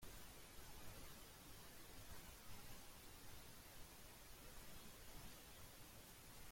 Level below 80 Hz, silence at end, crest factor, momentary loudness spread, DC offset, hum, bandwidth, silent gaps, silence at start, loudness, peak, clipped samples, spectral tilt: -66 dBFS; 0 s; 14 dB; 2 LU; under 0.1%; none; 16.5 kHz; none; 0 s; -60 LUFS; -44 dBFS; under 0.1%; -3 dB/octave